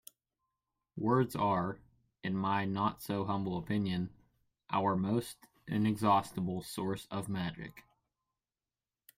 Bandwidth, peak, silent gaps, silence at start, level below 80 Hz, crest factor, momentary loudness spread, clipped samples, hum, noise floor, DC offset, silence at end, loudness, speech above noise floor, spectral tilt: 16 kHz; -16 dBFS; none; 0.95 s; -66 dBFS; 20 dB; 13 LU; under 0.1%; none; under -90 dBFS; under 0.1%; 1.35 s; -34 LUFS; over 57 dB; -6.5 dB/octave